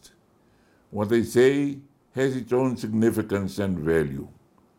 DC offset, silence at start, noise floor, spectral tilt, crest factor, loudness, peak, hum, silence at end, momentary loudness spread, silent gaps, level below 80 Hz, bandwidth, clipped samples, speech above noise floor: under 0.1%; 0.9 s; -61 dBFS; -6.5 dB/octave; 16 dB; -24 LUFS; -8 dBFS; none; 0.5 s; 17 LU; none; -54 dBFS; 16.5 kHz; under 0.1%; 37 dB